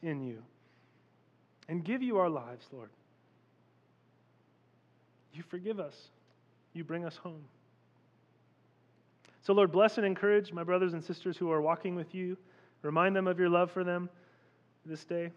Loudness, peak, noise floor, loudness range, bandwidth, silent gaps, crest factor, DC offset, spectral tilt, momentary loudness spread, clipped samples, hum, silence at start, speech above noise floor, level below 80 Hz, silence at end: -32 LUFS; -14 dBFS; -68 dBFS; 16 LU; 7.6 kHz; none; 22 dB; under 0.1%; -7.5 dB/octave; 20 LU; under 0.1%; none; 0 s; 36 dB; under -90 dBFS; 0.05 s